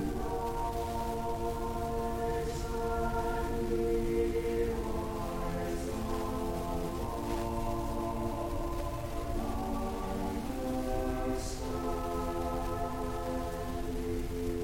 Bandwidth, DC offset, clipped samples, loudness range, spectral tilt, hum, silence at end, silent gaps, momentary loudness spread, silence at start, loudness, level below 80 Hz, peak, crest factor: 17 kHz; under 0.1%; under 0.1%; 3 LU; -6.5 dB/octave; none; 0 s; none; 4 LU; 0 s; -35 LUFS; -40 dBFS; -18 dBFS; 16 dB